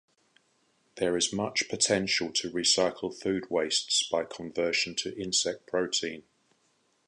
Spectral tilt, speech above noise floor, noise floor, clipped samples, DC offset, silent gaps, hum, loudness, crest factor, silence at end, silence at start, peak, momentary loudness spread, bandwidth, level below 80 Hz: -2 dB/octave; 41 dB; -71 dBFS; under 0.1%; under 0.1%; none; none; -28 LUFS; 20 dB; 0.9 s; 0.95 s; -10 dBFS; 8 LU; 11 kHz; -66 dBFS